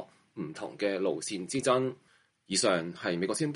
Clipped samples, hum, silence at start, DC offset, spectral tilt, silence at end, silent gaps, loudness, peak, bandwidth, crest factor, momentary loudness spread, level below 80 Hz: under 0.1%; none; 0 s; under 0.1%; -4 dB/octave; 0 s; none; -31 LUFS; -14 dBFS; 11.5 kHz; 18 dB; 14 LU; -72 dBFS